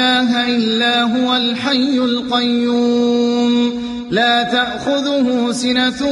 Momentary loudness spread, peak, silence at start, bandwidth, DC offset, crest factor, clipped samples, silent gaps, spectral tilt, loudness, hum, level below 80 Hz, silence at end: 3 LU; -2 dBFS; 0 s; 11.5 kHz; under 0.1%; 12 dB; under 0.1%; none; -4 dB/octave; -15 LUFS; none; -52 dBFS; 0 s